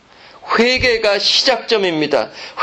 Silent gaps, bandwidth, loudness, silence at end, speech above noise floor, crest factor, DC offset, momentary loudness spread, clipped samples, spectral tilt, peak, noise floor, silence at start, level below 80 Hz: none; 9.2 kHz; -14 LUFS; 0 s; 23 dB; 16 dB; under 0.1%; 7 LU; under 0.1%; -3 dB/octave; -2 dBFS; -38 dBFS; 0.45 s; -44 dBFS